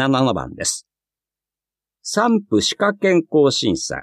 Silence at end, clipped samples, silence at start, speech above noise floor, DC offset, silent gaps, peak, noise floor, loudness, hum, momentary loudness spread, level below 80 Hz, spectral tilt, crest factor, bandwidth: 0 s; under 0.1%; 0 s; 72 dB; under 0.1%; none; -4 dBFS; -90 dBFS; -18 LUFS; none; 7 LU; -52 dBFS; -4 dB/octave; 16 dB; 14.5 kHz